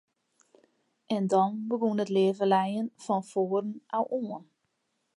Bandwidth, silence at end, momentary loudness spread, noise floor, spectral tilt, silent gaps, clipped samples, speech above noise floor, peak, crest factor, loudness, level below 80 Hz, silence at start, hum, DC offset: 11.5 kHz; 0.8 s; 9 LU; -78 dBFS; -7 dB/octave; none; under 0.1%; 50 dB; -12 dBFS; 18 dB; -29 LUFS; -84 dBFS; 1.1 s; none; under 0.1%